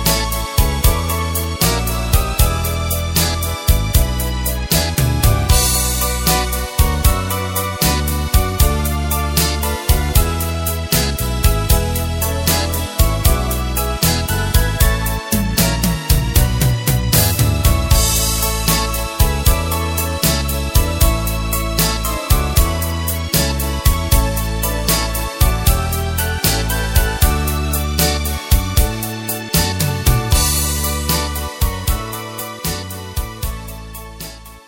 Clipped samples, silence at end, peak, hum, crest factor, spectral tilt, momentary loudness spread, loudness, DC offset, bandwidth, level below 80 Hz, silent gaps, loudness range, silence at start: under 0.1%; 0.1 s; 0 dBFS; none; 16 dB; -4 dB/octave; 6 LU; -17 LUFS; under 0.1%; 17 kHz; -20 dBFS; none; 2 LU; 0 s